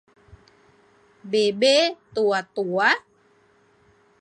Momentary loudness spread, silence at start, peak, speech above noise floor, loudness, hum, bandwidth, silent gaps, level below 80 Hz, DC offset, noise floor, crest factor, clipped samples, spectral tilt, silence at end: 8 LU; 1.25 s; -6 dBFS; 39 dB; -21 LUFS; none; 11.5 kHz; none; -66 dBFS; under 0.1%; -60 dBFS; 20 dB; under 0.1%; -3 dB/octave; 1.2 s